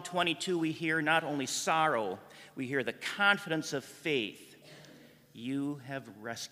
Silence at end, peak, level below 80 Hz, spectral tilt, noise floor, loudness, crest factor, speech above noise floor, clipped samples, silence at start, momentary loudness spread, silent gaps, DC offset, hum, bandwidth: 0.05 s; -10 dBFS; -80 dBFS; -3.5 dB/octave; -57 dBFS; -32 LUFS; 24 dB; 24 dB; under 0.1%; 0 s; 16 LU; none; under 0.1%; none; 15.5 kHz